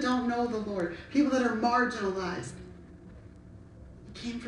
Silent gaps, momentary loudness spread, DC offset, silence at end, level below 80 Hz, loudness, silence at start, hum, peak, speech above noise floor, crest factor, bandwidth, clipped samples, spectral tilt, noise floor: none; 25 LU; under 0.1%; 0 s; -54 dBFS; -30 LUFS; 0 s; none; -14 dBFS; 21 dB; 16 dB; 10.5 kHz; under 0.1%; -5.5 dB/octave; -50 dBFS